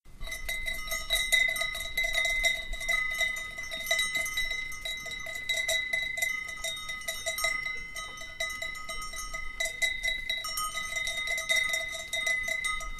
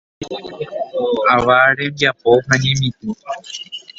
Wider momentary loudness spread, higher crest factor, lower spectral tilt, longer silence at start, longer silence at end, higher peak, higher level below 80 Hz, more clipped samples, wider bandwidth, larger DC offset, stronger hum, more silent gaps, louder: second, 10 LU vs 16 LU; about the same, 20 dB vs 18 dB; second, 0.5 dB/octave vs -4.5 dB/octave; second, 0.05 s vs 0.2 s; second, 0 s vs 0.2 s; second, -12 dBFS vs 0 dBFS; about the same, -46 dBFS vs -48 dBFS; neither; first, 15.5 kHz vs 8 kHz; neither; neither; neither; second, -30 LUFS vs -15 LUFS